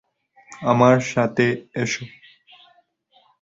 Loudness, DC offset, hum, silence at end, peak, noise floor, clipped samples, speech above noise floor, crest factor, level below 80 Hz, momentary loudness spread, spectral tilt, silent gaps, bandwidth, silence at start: -20 LUFS; under 0.1%; none; 1.35 s; -2 dBFS; -60 dBFS; under 0.1%; 41 dB; 20 dB; -60 dBFS; 13 LU; -6 dB/octave; none; 7.8 kHz; 0.5 s